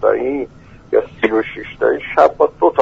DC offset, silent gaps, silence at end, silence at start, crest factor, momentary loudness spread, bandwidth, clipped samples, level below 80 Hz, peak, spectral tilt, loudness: under 0.1%; none; 0 s; 0 s; 16 dB; 10 LU; 7.6 kHz; under 0.1%; -46 dBFS; 0 dBFS; -6.5 dB/octave; -16 LUFS